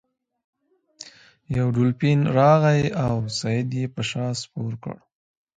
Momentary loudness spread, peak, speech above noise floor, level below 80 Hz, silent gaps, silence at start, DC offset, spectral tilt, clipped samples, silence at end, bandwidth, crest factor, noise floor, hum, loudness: 25 LU; -4 dBFS; 26 dB; -52 dBFS; none; 1 s; under 0.1%; -6.5 dB/octave; under 0.1%; 0.6 s; 9.2 kHz; 20 dB; -47 dBFS; none; -22 LUFS